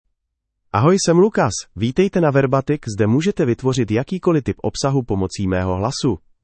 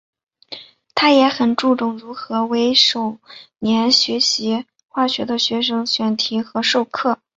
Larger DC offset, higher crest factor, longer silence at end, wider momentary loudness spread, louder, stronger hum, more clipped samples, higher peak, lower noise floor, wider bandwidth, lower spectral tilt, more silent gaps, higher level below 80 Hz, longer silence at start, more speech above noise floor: neither; about the same, 16 dB vs 18 dB; about the same, 0.25 s vs 0.25 s; second, 7 LU vs 14 LU; about the same, -18 LUFS vs -17 LUFS; neither; neither; about the same, -2 dBFS vs 0 dBFS; first, -76 dBFS vs -39 dBFS; about the same, 8.8 kHz vs 8 kHz; first, -6 dB/octave vs -3 dB/octave; neither; first, -46 dBFS vs -62 dBFS; first, 0.75 s vs 0.5 s; first, 59 dB vs 21 dB